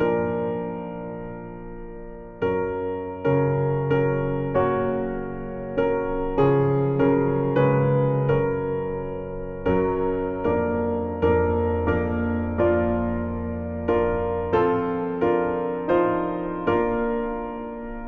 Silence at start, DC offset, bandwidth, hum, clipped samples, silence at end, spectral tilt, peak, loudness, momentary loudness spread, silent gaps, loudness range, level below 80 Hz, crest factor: 0 s; under 0.1%; 4.3 kHz; none; under 0.1%; 0 s; -10.5 dB/octave; -8 dBFS; -24 LUFS; 12 LU; none; 4 LU; -42 dBFS; 16 dB